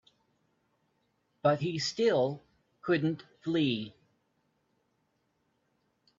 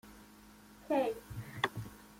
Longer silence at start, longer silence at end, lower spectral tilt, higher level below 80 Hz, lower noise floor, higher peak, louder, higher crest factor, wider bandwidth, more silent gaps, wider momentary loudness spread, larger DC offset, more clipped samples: first, 1.45 s vs 0.05 s; first, 2.3 s vs 0 s; about the same, -5.5 dB/octave vs -5.5 dB/octave; second, -74 dBFS vs -62 dBFS; first, -76 dBFS vs -58 dBFS; about the same, -12 dBFS vs -14 dBFS; first, -31 LUFS vs -37 LUFS; about the same, 22 dB vs 24 dB; second, 7.8 kHz vs 16.5 kHz; neither; second, 12 LU vs 23 LU; neither; neither